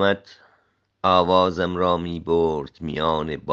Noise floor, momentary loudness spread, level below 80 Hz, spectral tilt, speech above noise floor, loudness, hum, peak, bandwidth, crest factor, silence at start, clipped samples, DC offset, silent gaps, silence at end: -65 dBFS; 10 LU; -52 dBFS; -7 dB/octave; 43 dB; -22 LUFS; none; -2 dBFS; 7.6 kHz; 20 dB; 0 s; under 0.1%; under 0.1%; none; 0 s